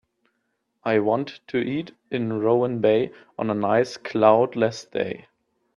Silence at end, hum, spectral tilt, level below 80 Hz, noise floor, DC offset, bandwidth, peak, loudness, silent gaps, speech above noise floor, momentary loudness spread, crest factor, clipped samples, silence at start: 0.6 s; none; -6.5 dB/octave; -66 dBFS; -75 dBFS; under 0.1%; 10.5 kHz; -2 dBFS; -23 LUFS; none; 52 dB; 12 LU; 20 dB; under 0.1%; 0.85 s